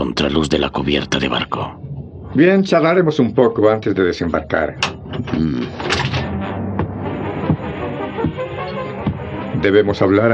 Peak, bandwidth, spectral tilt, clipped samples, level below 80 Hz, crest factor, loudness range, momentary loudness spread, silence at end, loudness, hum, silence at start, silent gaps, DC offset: 0 dBFS; 9.2 kHz; -6 dB/octave; under 0.1%; -40 dBFS; 16 dB; 6 LU; 11 LU; 0 s; -18 LUFS; none; 0 s; none; under 0.1%